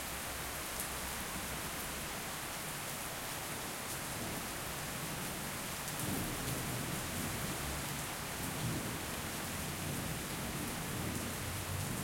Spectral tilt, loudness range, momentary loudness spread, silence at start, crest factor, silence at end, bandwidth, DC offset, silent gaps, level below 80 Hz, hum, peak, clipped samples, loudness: -3 dB/octave; 1 LU; 2 LU; 0 s; 18 dB; 0 s; 16.5 kHz; under 0.1%; none; -54 dBFS; none; -22 dBFS; under 0.1%; -39 LUFS